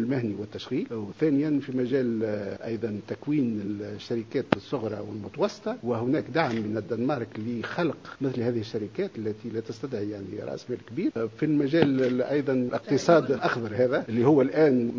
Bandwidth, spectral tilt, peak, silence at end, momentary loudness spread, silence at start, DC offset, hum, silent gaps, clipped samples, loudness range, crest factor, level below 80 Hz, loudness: 7.6 kHz; -7 dB/octave; 0 dBFS; 0 s; 12 LU; 0 s; under 0.1%; none; none; under 0.1%; 7 LU; 26 dB; -62 dBFS; -27 LUFS